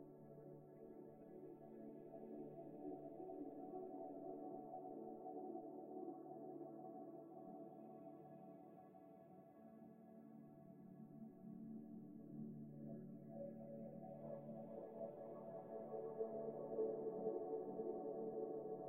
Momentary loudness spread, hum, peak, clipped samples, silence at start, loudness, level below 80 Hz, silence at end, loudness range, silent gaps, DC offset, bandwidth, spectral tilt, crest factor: 14 LU; none; -32 dBFS; under 0.1%; 0 s; -53 LUFS; -88 dBFS; 0 s; 12 LU; none; under 0.1%; 15 kHz; -10.5 dB/octave; 20 dB